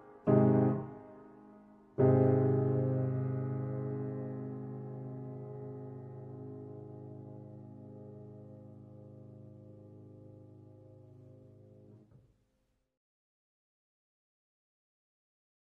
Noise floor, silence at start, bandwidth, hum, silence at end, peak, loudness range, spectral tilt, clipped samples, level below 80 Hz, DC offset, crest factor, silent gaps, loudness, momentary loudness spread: -79 dBFS; 0 s; 2.7 kHz; none; 3.8 s; -16 dBFS; 24 LU; -13 dB/octave; under 0.1%; -68 dBFS; under 0.1%; 22 dB; none; -32 LUFS; 27 LU